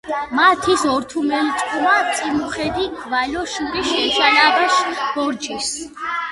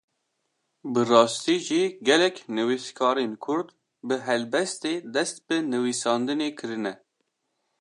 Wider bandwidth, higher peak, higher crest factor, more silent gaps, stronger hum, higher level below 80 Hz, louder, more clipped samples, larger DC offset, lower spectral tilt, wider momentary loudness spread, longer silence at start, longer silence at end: about the same, 11.5 kHz vs 11.5 kHz; first, 0 dBFS vs -4 dBFS; about the same, 18 dB vs 22 dB; neither; neither; first, -48 dBFS vs -80 dBFS; first, -18 LUFS vs -25 LUFS; neither; neither; second, -2 dB/octave vs -3.5 dB/octave; about the same, 10 LU vs 11 LU; second, 0.05 s vs 0.85 s; second, 0 s vs 0.85 s